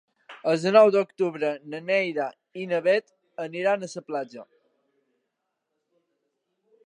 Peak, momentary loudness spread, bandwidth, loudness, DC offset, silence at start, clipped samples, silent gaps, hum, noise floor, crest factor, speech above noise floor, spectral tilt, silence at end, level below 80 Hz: -4 dBFS; 17 LU; 10.5 kHz; -24 LUFS; under 0.1%; 0.3 s; under 0.1%; none; none; -81 dBFS; 22 dB; 57 dB; -5.5 dB/octave; 2.4 s; -84 dBFS